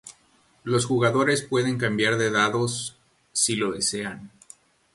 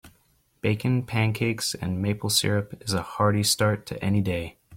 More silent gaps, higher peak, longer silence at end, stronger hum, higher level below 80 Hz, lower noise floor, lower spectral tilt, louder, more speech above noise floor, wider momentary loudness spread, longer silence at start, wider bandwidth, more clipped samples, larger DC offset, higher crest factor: neither; about the same, -6 dBFS vs -8 dBFS; first, 0.65 s vs 0 s; neither; second, -62 dBFS vs -54 dBFS; second, -61 dBFS vs -65 dBFS; about the same, -3.5 dB/octave vs -4.5 dB/octave; about the same, -23 LUFS vs -25 LUFS; about the same, 38 dB vs 40 dB; first, 11 LU vs 7 LU; about the same, 0.05 s vs 0.05 s; second, 12 kHz vs 16.5 kHz; neither; neither; about the same, 18 dB vs 18 dB